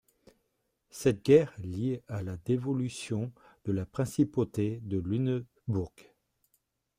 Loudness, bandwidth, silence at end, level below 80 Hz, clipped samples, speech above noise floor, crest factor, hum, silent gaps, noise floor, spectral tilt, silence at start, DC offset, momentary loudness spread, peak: -31 LUFS; 16 kHz; 0.95 s; -62 dBFS; under 0.1%; 49 dB; 22 dB; none; none; -79 dBFS; -7.5 dB/octave; 0.95 s; under 0.1%; 13 LU; -10 dBFS